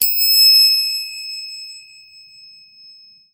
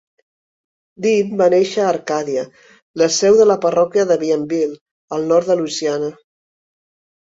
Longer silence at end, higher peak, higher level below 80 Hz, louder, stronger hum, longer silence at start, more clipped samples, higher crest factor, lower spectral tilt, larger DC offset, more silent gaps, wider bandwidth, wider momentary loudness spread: first, 1.55 s vs 1.1 s; about the same, 0 dBFS vs -2 dBFS; second, -70 dBFS vs -62 dBFS; first, -10 LUFS vs -16 LUFS; neither; second, 0 s vs 1 s; neither; about the same, 18 dB vs 16 dB; second, 5.5 dB/octave vs -4.5 dB/octave; neither; second, none vs 2.82-2.94 s, 4.81-5.08 s; first, 16 kHz vs 8 kHz; first, 22 LU vs 12 LU